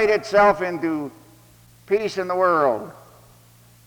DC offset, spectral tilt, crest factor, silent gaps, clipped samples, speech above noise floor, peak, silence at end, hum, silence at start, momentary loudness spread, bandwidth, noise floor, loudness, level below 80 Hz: under 0.1%; -5.5 dB/octave; 18 dB; none; under 0.1%; 31 dB; -4 dBFS; 0.9 s; none; 0 s; 13 LU; over 20 kHz; -51 dBFS; -20 LUFS; -56 dBFS